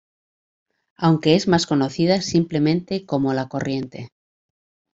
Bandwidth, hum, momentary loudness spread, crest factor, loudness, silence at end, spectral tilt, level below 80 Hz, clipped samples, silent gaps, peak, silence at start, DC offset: 8 kHz; none; 9 LU; 20 dB; -20 LUFS; 0.85 s; -6 dB/octave; -58 dBFS; under 0.1%; none; -2 dBFS; 1 s; under 0.1%